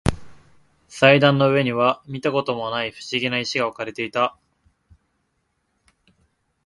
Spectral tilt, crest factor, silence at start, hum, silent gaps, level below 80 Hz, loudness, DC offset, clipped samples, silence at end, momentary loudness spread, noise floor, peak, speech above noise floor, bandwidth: -5.5 dB/octave; 22 dB; 0.05 s; none; none; -44 dBFS; -20 LUFS; under 0.1%; under 0.1%; 2.35 s; 11 LU; -71 dBFS; 0 dBFS; 51 dB; 11.5 kHz